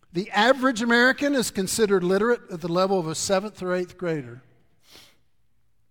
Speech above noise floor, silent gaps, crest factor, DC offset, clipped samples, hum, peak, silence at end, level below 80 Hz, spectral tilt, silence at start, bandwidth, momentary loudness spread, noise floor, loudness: 49 dB; none; 18 dB; under 0.1%; under 0.1%; none; -6 dBFS; 1.5 s; -60 dBFS; -4 dB/octave; 0.15 s; 18 kHz; 10 LU; -72 dBFS; -23 LUFS